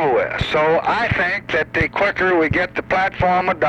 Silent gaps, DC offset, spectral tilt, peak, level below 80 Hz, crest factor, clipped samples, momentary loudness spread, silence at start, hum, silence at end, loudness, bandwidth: none; under 0.1%; -6.5 dB/octave; -4 dBFS; -38 dBFS; 12 dB; under 0.1%; 3 LU; 0 s; none; 0 s; -18 LUFS; 9 kHz